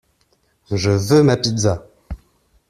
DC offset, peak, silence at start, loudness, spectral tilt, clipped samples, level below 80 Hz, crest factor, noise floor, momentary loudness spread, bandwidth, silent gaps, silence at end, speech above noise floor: under 0.1%; -2 dBFS; 0.7 s; -17 LUFS; -5.5 dB/octave; under 0.1%; -42 dBFS; 16 dB; -62 dBFS; 23 LU; 14.5 kHz; none; 0.55 s; 47 dB